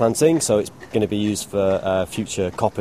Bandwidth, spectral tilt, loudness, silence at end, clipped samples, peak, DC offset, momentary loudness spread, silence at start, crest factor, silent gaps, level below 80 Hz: 15.5 kHz; -5 dB/octave; -21 LUFS; 0 s; under 0.1%; -4 dBFS; 0.2%; 7 LU; 0 s; 16 dB; none; -50 dBFS